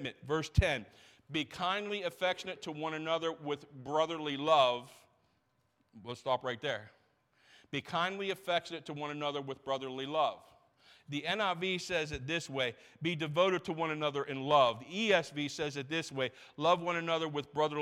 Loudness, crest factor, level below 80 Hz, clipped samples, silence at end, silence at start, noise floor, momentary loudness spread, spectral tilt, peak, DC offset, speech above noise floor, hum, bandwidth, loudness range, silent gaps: -34 LUFS; 22 dB; -54 dBFS; under 0.1%; 0 s; 0 s; -76 dBFS; 11 LU; -4.5 dB/octave; -14 dBFS; under 0.1%; 42 dB; none; 15 kHz; 6 LU; none